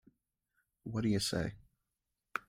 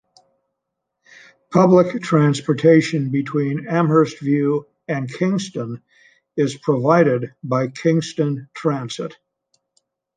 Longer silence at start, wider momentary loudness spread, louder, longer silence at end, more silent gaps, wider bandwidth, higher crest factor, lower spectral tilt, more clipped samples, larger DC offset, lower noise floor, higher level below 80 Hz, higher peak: second, 0.85 s vs 1.5 s; about the same, 11 LU vs 13 LU; second, -36 LUFS vs -19 LUFS; second, 0.1 s vs 1.05 s; neither; first, 16 kHz vs 9.6 kHz; about the same, 22 dB vs 18 dB; second, -5 dB/octave vs -7 dB/octave; neither; neither; first, -88 dBFS vs -79 dBFS; about the same, -62 dBFS vs -64 dBFS; second, -18 dBFS vs -2 dBFS